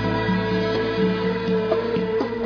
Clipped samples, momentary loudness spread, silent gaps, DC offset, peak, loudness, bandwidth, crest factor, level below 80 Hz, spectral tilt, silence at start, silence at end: under 0.1%; 2 LU; none; under 0.1%; -8 dBFS; -22 LUFS; 5.4 kHz; 14 dB; -44 dBFS; -8 dB/octave; 0 s; 0 s